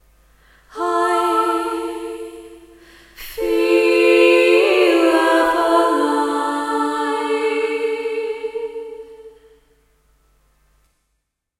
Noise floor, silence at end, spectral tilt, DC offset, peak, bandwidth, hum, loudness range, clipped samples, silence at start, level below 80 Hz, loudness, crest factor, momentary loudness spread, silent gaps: -73 dBFS; 2.3 s; -2.5 dB/octave; under 0.1%; -2 dBFS; 15.5 kHz; none; 13 LU; under 0.1%; 0.75 s; -54 dBFS; -17 LUFS; 18 dB; 18 LU; none